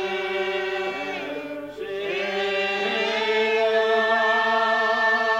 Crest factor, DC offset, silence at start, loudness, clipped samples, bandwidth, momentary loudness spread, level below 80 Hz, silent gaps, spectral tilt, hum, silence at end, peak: 14 dB; under 0.1%; 0 s; -22 LUFS; under 0.1%; 15.5 kHz; 11 LU; -64 dBFS; none; -3 dB/octave; 50 Hz at -65 dBFS; 0 s; -10 dBFS